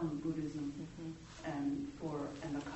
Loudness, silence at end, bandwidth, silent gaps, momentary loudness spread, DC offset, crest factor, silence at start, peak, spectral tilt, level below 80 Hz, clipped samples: -42 LUFS; 0 s; 8.2 kHz; none; 8 LU; under 0.1%; 14 dB; 0 s; -26 dBFS; -6.5 dB/octave; -62 dBFS; under 0.1%